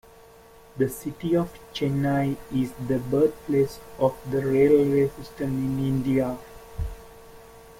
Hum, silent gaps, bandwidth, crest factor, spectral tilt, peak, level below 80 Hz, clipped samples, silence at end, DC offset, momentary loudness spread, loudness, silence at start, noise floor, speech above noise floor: none; none; 16.5 kHz; 18 dB; -7.5 dB/octave; -8 dBFS; -46 dBFS; under 0.1%; 0.2 s; under 0.1%; 16 LU; -25 LUFS; 0.75 s; -50 dBFS; 26 dB